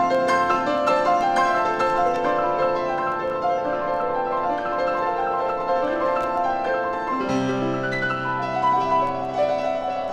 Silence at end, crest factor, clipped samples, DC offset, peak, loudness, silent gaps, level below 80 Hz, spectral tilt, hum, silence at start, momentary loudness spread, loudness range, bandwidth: 0 s; 14 dB; under 0.1%; under 0.1%; -8 dBFS; -22 LUFS; none; -52 dBFS; -5.5 dB/octave; none; 0 s; 4 LU; 2 LU; 11 kHz